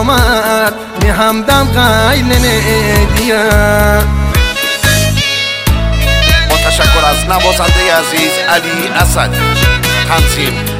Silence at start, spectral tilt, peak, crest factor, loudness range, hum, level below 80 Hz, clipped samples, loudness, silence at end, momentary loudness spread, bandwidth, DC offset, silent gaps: 0 s; -4 dB/octave; 0 dBFS; 10 dB; 1 LU; none; -16 dBFS; 0.4%; -10 LUFS; 0 s; 4 LU; 16.5 kHz; under 0.1%; none